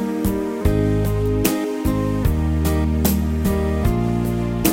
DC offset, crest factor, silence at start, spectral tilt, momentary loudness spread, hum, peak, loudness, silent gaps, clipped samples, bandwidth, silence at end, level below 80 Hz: under 0.1%; 18 dB; 0 s; -6.5 dB/octave; 3 LU; none; -2 dBFS; -20 LUFS; none; under 0.1%; 16.5 kHz; 0 s; -26 dBFS